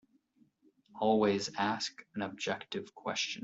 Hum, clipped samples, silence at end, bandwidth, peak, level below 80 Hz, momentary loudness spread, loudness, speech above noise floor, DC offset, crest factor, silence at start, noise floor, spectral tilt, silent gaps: none; under 0.1%; 0 s; 8 kHz; -16 dBFS; -76 dBFS; 11 LU; -34 LUFS; 36 dB; under 0.1%; 20 dB; 0.95 s; -70 dBFS; -4 dB/octave; none